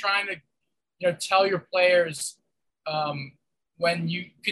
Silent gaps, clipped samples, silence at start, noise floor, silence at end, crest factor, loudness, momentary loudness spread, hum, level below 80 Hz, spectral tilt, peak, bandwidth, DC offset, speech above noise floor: none; under 0.1%; 0 s; -83 dBFS; 0 s; 18 dB; -25 LUFS; 15 LU; none; -76 dBFS; -3.5 dB/octave; -8 dBFS; 12.5 kHz; under 0.1%; 58 dB